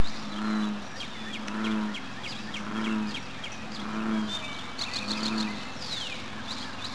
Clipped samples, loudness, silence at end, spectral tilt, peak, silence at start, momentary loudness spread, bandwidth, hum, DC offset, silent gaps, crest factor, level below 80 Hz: under 0.1%; -33 LUFS; 0 s; -4 dB/octave; -10 dBFS; 0 s; 7 LU; 11 kHz; none; 1%; none; 20 dB; -58 dBFS